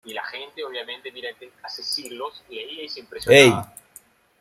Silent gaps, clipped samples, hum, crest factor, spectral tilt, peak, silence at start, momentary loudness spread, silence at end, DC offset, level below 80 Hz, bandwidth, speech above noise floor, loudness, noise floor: none; under 0.1%; none; 22 dB; -4 dB/octave; 0 dBFS; 0.05 s; 23 LU; 0.75 s; under 0.1%; -60 dBFS; 16 kHz; 30 dB; -19 LUFS; -52 dBFS